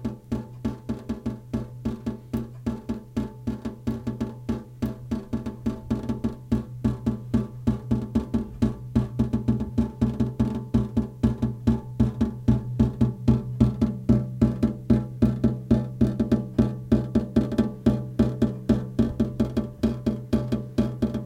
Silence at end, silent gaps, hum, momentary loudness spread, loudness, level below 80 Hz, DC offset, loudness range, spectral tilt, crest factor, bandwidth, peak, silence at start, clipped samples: 0 s; none; none; 9 LU; -26 LUFS; -36 dBFS; under 0.1%; 8 LU; -9 dB/octave; 20 dB; 10 kHz; -6 dBFS; 0 s; under 0.1%